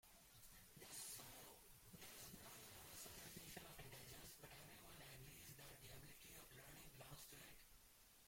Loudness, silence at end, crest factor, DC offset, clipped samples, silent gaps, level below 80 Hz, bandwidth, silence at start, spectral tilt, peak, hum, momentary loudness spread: -59 LUFS; 0 s; 20 dB; under 0.1%; under 0.1%; none; -74 dBFS; 16.5 kHz; 0.05 s; -2.5 dB/octave; -42 dBFS; none; 8 LU